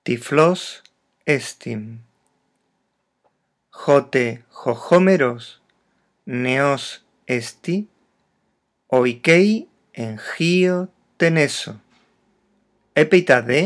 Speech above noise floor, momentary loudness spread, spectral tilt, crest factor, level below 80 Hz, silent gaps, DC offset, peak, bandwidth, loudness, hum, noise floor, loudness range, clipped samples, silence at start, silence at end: 53 dB; 17 LU; -5.5 dB/octave; 20 dB; -74 dBFS; none; under 0.1%; 0 dBFS; 11 kHz; -19 LUFS; none; -71 dBFS; 6 LU; under 0.1%; 0.05 s; 0 s